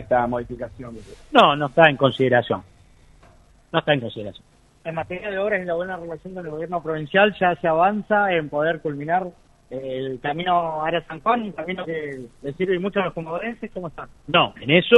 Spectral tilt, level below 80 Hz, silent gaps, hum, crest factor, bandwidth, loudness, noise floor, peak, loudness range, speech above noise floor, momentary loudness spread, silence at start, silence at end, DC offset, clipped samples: -7 dB/octave; -52 dBFS; none; none; 22 dB; 11 kHz; -22 LUFS; -52 dBFS; 0 dBFS; 7 LU; 30 dB; 17 LU; 0 s; 0 s; under 0.1%; under 0.1%